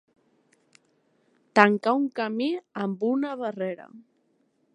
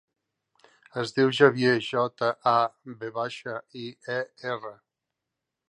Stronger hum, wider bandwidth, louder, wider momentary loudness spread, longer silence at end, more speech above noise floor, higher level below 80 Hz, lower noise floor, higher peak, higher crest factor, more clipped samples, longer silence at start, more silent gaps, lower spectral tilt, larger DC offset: neither; about the same, 9.6 kHz vs 10.5 kHz; about the same, -25 LUFS vs -26 LUFS; second, 13 LU vs 18 LU; second, 0.75 s vs 1 s; second, 44 dB vs 59 dB; about the same, -78 dBFS vs -74 dBFS; second, -69 dBFS vs -85 dBFS; first, 0 dBFS vs -4 dBFS; about the same, 26 dB vs 24 dB; neither; first, 1.55 s vs 0.95 s; neither; about the same, -6.5 dB/octave vs -5.5 dB/octave; neither